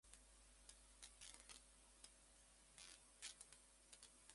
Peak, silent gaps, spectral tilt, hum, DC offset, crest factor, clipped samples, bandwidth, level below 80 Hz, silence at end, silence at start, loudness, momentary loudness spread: -38 dBFS; none; -0.5 dB/octave; none; under 0.1%; 26 dB; under 0.1%; 11.5 kHz; -76 dBFS; 0 s; 0.05 s; -63 LUFS; 11 LU